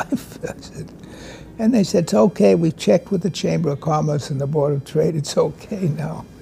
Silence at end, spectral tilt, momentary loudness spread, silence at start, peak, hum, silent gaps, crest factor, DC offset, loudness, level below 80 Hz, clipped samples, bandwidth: 0 s; -6.5 dB/octave; 20 LU; 0 s; -4 dBFS; none; none; 16 dB; under 0.1%; -19 LUFS; -50 dBFS; under 0.1%; 15.5 kHz